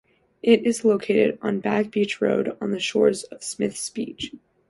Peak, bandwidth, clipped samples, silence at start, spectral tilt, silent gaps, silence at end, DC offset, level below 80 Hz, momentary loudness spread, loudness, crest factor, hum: -4 dBFS; 11.5 kHz; under 0.1%; 0.45 s; -4.5 dB/octave; none; 0.35 s; under 0.1%; -64 dBFS; 11 LU; -23 LUFS; 18 dB; none